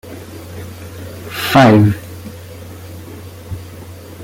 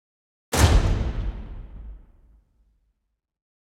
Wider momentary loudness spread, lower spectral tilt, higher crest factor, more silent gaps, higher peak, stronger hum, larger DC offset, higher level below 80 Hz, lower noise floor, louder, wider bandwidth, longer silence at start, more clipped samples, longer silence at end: about the same, 24 LU vs 24 LU; first, -6.5 dB/octave vs -5 dB/octave; second, 16 dB vs 22 dB; neither; first, 0 dBFS vs -4 dBFS; neither; neither; second, -46 dBFS vs -28 dBFS; second, -33 dBFS vs -76 dBFS; first, -12 LUFS vs -23 LUFS; about the same, 17 kHz vs 17 kHz; second, 0.05 s vs 0.5 s; neither; second, 0 s vs 1.7 s